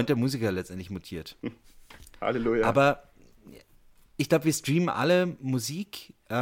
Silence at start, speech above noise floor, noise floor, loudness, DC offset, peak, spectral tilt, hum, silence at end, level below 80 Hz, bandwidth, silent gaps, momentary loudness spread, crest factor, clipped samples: 0 s; 31 dB; -57 dBFS; -27 LUFS; under 0.1%; -10 dBFS; -5.5 dB/octave; none; 0 s; -56 dBFS; 17 kHz; none; 16 LU; 20 dB; under 0.1%